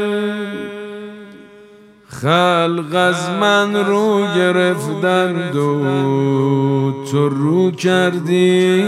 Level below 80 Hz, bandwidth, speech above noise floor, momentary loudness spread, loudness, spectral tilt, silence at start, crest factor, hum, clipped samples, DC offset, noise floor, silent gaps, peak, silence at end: -64 dBFS; 14.5 kHz; 29 dB; 11 LU; -16 LUFS; -6 dB/octave; 0 s; 16 dB; none; under 0.1%; under 0.1%; -44 dBFS; none; 0 dBFS; 0 s